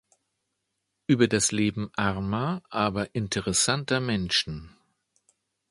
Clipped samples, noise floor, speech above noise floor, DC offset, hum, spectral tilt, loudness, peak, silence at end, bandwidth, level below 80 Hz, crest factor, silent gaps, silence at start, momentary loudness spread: under 0.1%; -80 dBFS; 54 dB; under 0.1%; none; -4 dB/octave; -26 LUFS; -8 dBFS; 1 s; 11.5 kHz; -52 dBFS; 20 dB; none; 1.1 s; 8 LU